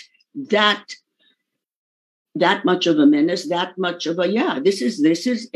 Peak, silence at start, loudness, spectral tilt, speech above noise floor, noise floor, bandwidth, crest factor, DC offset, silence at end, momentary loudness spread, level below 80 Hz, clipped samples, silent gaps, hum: -2 dBFS; 0.35 s; -19 LUFS; -4.5 dB/octave; 52 dB; -71 dBFS; 12 kHz; 18 dB; under 0.1%; 0.1 s; 18 LU; -82 dBFS; under 0.1%; 1.75-2.25 s; none